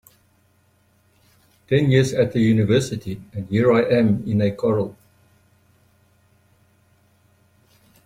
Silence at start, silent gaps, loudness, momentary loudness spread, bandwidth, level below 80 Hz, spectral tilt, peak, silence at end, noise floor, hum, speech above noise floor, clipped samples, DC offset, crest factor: 1.7 s; none; -20 LUFS; 13 LU; 15 kHz; -54 dBFS; -7 dB/octave; -4 dBFS; 3.15 s; -61 dBFS; none; 42 dB; under 0.1%; under 0.1%; 18 dB